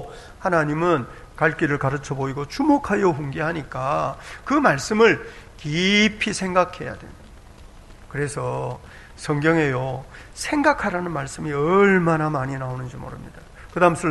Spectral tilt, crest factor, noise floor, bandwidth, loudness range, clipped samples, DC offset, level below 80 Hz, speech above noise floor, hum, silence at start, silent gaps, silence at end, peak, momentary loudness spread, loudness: -5.5 dB/octave; 20 dB; -44 dBFS; 12 kHz; 5 LU; under 0.1%; under 0.1%; -46 dBFS; 22 dB; none; 0 s; none; 0 s; -2 dBFS; 17 LU; -21 LUFS